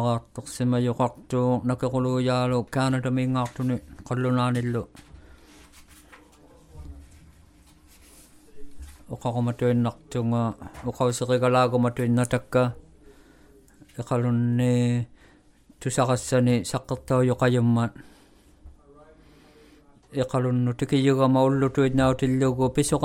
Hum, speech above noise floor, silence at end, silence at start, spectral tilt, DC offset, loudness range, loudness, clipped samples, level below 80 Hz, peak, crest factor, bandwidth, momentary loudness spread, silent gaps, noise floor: none; 32 dB; 0 s; 0 s; -6.5 dB/octave; under 0.1%; 7 LU; -24 LUFS; under 0.1%; -52 dBFS; -8 dBFS; 18 dB; 13.5 kHz; 11 LU; none; -56 dBFS